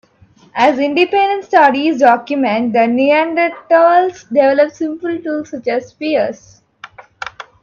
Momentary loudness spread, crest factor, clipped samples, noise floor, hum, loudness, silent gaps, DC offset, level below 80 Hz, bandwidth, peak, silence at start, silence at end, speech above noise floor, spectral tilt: 11 LU; 14 dB; under 0.1%; -48 dBFS; none; -14 LUFS; none; under 0.1%; -62 dBFS; 7.2 kHz; 0 dBFS; 0.55 s; 0.2 s; 35 dB; -5 dB/octave